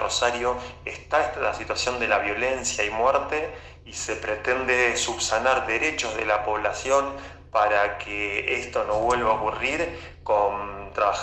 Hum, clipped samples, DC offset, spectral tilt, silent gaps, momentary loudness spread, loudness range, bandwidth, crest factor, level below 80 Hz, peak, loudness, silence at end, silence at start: none; under 0.1%; under 0.1%; -2.5 dB/octave; none; 10 LU; 2 LU; 12 kHz; 18 dB; -46 dBFS; -8 dBFS; -24 LUFS; 0 s; 0 s